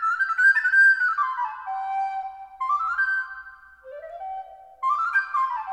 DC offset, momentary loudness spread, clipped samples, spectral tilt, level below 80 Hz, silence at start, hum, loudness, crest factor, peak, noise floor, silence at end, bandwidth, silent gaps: under 0.1%; 21 LU; under 0.1%; 1 dB/octave; -68 dBFS; 0 s; none; -21 LUFS; 14 dB; -10 dBFS; -45 dBFS; 0 s; 11.5 kHz; none